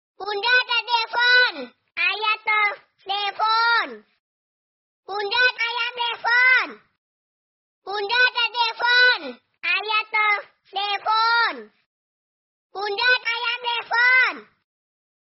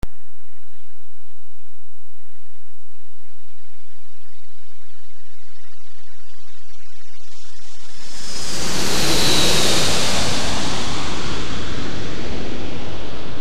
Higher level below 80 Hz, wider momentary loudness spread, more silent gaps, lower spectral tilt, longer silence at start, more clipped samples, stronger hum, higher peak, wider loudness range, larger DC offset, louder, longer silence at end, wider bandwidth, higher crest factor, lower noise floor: second, -72 dBFS vs -40 dBFS; second, 15 LU vs 24 LU; first, 4.19-5.03 s, 6.98-7.82 s, 11.86-12.70 s vs none; second, 5 dB/octave vs -3 dB/octave; first, 0.2 s vs 0 s; neither; neither; second, -6 dBFS vs -2 dBFS; second, 3 LU vs 15 LU; second, under 0.1% vs 30%; about the same, -20 LUFS vs -21 LUFS; first, 0.8 s vs 0 s; second, 6 kHz vs 19.5 kHz; second, 16 dB vs 22 dB; first, under -90 dBFS vs -59 dBFS